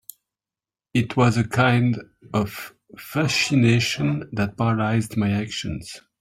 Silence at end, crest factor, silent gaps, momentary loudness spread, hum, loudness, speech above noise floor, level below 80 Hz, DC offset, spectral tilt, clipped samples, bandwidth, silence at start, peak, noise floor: 0.25 s; 16 dB; none; 13 LU; none; -22 LUFS; over 69 dB; -52 dBFS; under 0.1%; -5.5 dB/octave; under 0.1%; 15.5 kHz; 0.95 s; -6 dBFS; under -90 dBFS